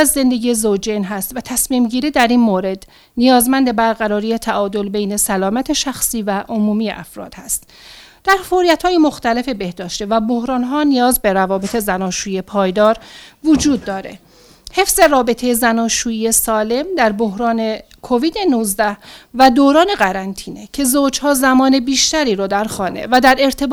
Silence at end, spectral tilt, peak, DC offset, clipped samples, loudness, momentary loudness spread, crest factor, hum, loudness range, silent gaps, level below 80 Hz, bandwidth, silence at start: 0 s; -3.5 dB/octave; 0 dBFS; under 0.1%; under 0.1%; -15 LUFS; 11 LU; 16 dB; none; 4 LU; none; -42 dBFS; over 20 kHz; 0 s